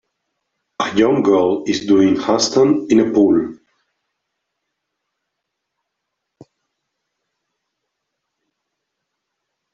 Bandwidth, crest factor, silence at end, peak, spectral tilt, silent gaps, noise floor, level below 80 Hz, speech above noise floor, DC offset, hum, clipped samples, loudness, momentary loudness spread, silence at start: 7.8 kHz; 18 dB; 6.2 s; -2 dBFS; -5 dB/octave; none; -78 dBFS; -58 dBFS; 63 dB; under 0.1%; none; under 0.1%; -15 LUFS; 7 LU; 0.8 s